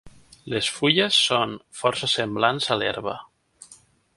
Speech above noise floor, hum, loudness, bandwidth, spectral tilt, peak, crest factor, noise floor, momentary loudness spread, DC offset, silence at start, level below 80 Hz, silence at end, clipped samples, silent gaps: 30 dB; none; -22 LUFS; 11.5 kHz; -3 dB/octave; -2 dBFS; 22 dB; -54 dBFS; 12 LU; under 0.1%; 0.05 s; -60 dBFS; 0.4 s; under 0.1%; none